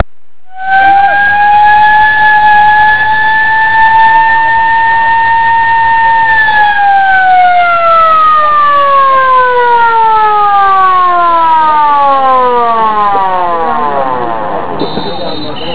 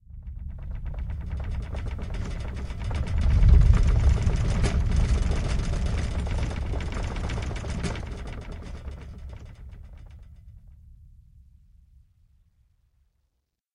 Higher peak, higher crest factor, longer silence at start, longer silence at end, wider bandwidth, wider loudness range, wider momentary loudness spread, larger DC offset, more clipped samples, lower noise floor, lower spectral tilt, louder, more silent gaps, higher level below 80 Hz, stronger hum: first, 0 dBFS vs -6 dBFS; second, 8 dB vs 20 dB; first, 0.55 s vs 0.1 s; second, 0 s vs 2.7 s; second, 4 kHz vs 10.5 kHz; second, 3 LU vs 19 LU; second, 8 LU vs 21 LU; first, 10% vs under 0.1%; first, 0.9% vs under 0.1%; second, -49 dBFS vs -77 dBFS; about the same, -7 dB/octave vs -6.5 dB/octave; first, -6 LUFS vs -28 LUFS; neither; second, -40 dBFS vs -28 dBFS; neither